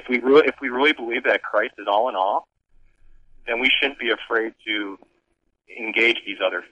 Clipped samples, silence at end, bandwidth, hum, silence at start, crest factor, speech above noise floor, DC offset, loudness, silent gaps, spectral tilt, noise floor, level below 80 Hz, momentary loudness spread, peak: under 0.1%; 0.05 s; 8.6 kHz; none; 0.05 s; 18 dB; 49 dB; under 0.1%; -21 LUFS; none; -4 dB/octave; -70 dBFS; -58 dBFS; 11 LU; -4 dBFS